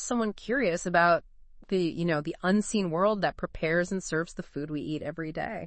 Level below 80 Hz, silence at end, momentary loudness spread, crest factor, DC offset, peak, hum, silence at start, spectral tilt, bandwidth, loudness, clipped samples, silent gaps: -52 dBFS; 0 s; 10 LU; 18 dB; under 0.1%; -10 dBFS; none; 0 s; -5 dB/octave; 8.8 kHz; -29 LUFS; under 0.1%; none